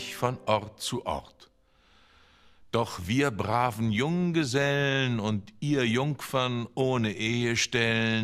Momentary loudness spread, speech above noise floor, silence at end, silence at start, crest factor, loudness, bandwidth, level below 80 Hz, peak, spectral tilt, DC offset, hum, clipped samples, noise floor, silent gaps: 7 LU; 35 dB; 0 s; 0 s; 20 dB; -28 LUFS; 15.5 kHz; -58 dBFS; -8 dBFS; -5 dB/octave; under 0.1%; none; under 0.1%; -63 dBFS; none